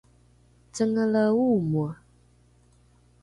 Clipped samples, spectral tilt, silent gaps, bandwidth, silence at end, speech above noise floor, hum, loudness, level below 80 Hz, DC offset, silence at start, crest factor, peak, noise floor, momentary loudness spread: under 0.1%; -7.5 dB/octave; none; 11 kHz; 1.3 s; 36 dB; 60 Hz at -50 dBFS; -24 LUFS; -60 dBFS; under 0.1%; 0.75 s; 14 dB; -12 dBFS; -59 dBFS; 16 LU